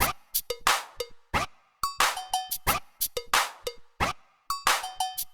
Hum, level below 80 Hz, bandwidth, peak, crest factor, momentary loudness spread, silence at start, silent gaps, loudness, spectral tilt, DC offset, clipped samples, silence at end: none; -50 dBFS; over 20 kHz; -8 dBFS; 22 dB; 12 LU; 0 s; none; -28 LUFS; -1 dB/octave; under 0.1%; under 0.1%; 0 s